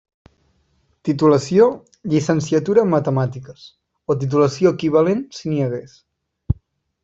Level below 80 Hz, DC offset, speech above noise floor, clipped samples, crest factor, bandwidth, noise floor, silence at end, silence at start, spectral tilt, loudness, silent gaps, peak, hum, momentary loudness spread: -46 dBFS; under 0.1%; 46 dB; under 0.1%; 16 dB; 8 kHz; -63 dBFS; 0.5 s; 1.05 s; -7 dB/octave; -18 LUFS; none; -2 dBFS; none; 11 LU